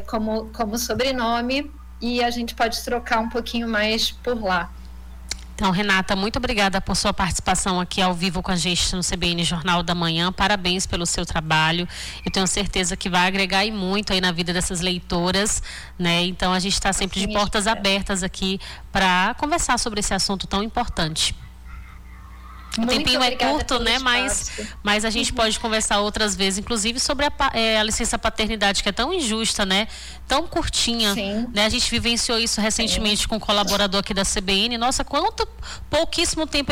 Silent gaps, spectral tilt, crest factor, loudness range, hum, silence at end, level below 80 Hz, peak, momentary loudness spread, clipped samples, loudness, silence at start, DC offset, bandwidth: none; -3 dB/octave; 14 dB; 3 LU; none; 0 s; -36 dBFS; -8 dBFS; 7 LU; under 0.1%; -21 LUFS; 0 s; under 0.1%; 19 kHz